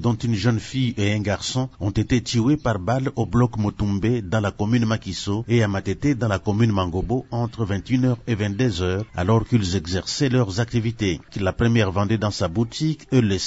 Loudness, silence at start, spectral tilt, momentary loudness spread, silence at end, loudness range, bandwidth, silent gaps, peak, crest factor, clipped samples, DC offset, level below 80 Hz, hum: -22 LUFS; 0 s; -6 dB/octave; 5 LU; 0 s; 1 LU; 8 kHz; none; -6 dBFS; 16 dB; under 0.1%; 0.1%; -42 dBFS; none